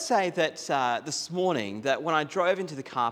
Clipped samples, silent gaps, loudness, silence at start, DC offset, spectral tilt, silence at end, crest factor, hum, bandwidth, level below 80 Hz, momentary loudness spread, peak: under 0.1%; none; -28 LUFS; 0 s; under 0.1%; -3.5 dB/octave; 0 s; 18 dB; none; 18 kHz; -78 dBFS; 5 LU; -10 dBFS